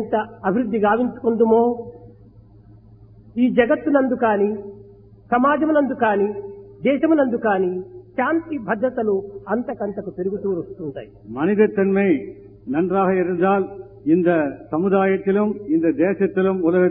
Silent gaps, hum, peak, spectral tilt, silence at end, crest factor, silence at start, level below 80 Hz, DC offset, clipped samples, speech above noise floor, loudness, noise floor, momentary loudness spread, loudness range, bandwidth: none; none; -2 dBFS; -11.5 dB/octave; 0 s; 18 dB; 0 s; -56 dBFS; under 0.1%; under 0.1%; 28 dB; -20 LUFS; -47 dBFS; 14 LU; 4 LU; 3.8 kHz